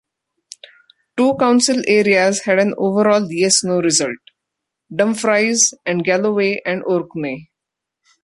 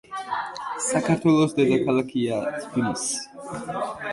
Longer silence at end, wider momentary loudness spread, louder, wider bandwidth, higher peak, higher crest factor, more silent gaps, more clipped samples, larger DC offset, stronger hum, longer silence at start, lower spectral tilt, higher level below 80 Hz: first, 0.8 s vs 0 s; about the same, 11 LU vs 11 LU; first, -16 LUFS vs -24 LUFS; about the same, 11.5 kHz vs 11.5 kHz; first, 0 dBFS vs -8 dBFS; about the same, 18 dB vs 16 dB; neither; neither; neither; neither; first, 1.15 s vs 0.1 s; second, -3 dB/octave vs -5 dB/octave; about the same, -62 dBFS vs -60 dBFS